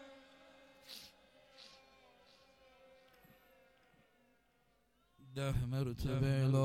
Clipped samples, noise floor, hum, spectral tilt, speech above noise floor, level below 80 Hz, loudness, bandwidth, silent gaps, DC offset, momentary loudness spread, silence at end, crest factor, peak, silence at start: under 0.1%; -75 dBFS; none; -7 dB/octave; 41 dB; -56 dBFS; -39 LUFS; 15 kHz; none; under 0.1%; 27 LU; 0 s; 20 dB; -20 dBFS; 0 s